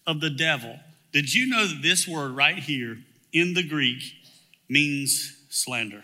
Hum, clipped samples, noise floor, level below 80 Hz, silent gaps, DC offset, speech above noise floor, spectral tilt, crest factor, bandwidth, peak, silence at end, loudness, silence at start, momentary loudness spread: none; under 0.1%; -56 dBFS; -80 dBFS; none; under 0.1%; 31 dB; -2.5 dB/octave; 22 dB; 16 kHz; -4 dBFS; 0 s; -23 LUFS; 0.05 s; 9 LU